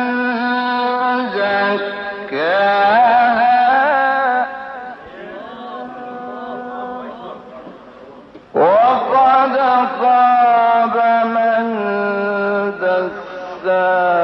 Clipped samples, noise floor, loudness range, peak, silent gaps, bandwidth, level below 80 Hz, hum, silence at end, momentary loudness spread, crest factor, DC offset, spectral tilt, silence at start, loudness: under 0.1%; -39 dBFS; 15 LU; -2 dBFS; none; 5.8 kHz; -62 dBFS; none; 0 s; 18 LU; 12 dB; under 0.1%; -6.5 dB/octave; 0 s; -15 LUFS